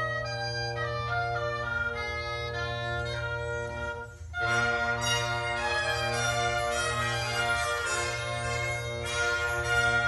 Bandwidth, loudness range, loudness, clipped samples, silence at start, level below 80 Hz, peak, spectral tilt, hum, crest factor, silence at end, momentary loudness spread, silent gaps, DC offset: 11.5 kHz; 4 LU; -29 LUFS; under 0.1%; 0 s; -46 dBFS; -14 dBFS; -3 dB/octave; none; 16 dB; 0 s; 6 LU; none; under 0.1%